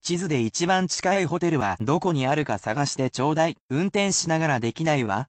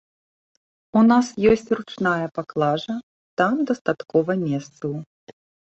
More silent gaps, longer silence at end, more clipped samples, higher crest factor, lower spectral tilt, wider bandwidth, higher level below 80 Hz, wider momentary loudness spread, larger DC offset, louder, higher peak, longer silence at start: second, 3.60-3.69 s vs 3.03-3.37 s, 3.81-3.85 s, 5.06-5.27 s; second, 0.05 s vs 0.35 s; neither; about the same, 14 dB vs 18 dB; second, -4.5 dB/octave vs -6.5 dB/octave; first, 9.2 kHz vs 8.2 kHz; about the same, -60 dBFS vs -56 dBFS; second, 3 LU vs 13 LU; neither; about the same, -24 LUFS vs -22 LUFS; second, -10 dBFS vs -4 dBFS; second, 0.05 s vs 0.95 s